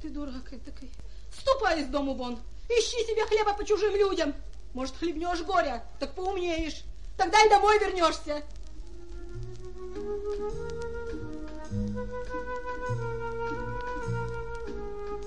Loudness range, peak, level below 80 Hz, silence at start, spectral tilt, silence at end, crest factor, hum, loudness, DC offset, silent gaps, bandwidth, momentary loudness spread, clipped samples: 11 LU; -6 dBFS; -44 dBFS; 0 s; -4.5 dB/octave; 0 s; 22 dB; none; -29 LUFS; 1%; none; 11 kHz; 20 LU; under 0.1%